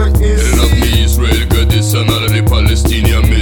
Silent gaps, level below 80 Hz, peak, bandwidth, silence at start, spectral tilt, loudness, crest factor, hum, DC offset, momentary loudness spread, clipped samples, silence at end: none; -12 dBFS; 0 dBFS; 17.5 kHz; 0 s; -5 dB/octave; -11 LUFS; 10 dB; none; under 0.1%; 1 LU; under 0.1%; 0 s